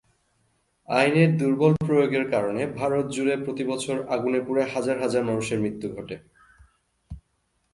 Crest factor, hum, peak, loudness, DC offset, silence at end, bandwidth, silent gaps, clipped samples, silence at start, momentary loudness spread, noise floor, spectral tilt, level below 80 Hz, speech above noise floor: 20 dB; none; -6 dBFS; -24 LUFS; under 0.1%; 0.55 s; 11.5 kHz; none; under 0.1%; 0.9 s; 17 LU; -72 dBFS; -6.5 dB/octave; -56 dBFS; 48 dB